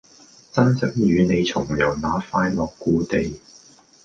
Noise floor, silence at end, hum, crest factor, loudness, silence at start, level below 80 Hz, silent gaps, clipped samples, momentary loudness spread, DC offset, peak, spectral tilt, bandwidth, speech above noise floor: -50 dBFS; 0.65 s; none; 18 dB; -21 LUFS; 0.55 s; -44 dBFS; none; under 0.1%; 6 LU; under 0.1%; -2 dBFS; -6.5 dB/octave; 7.6 kHz; 29 dB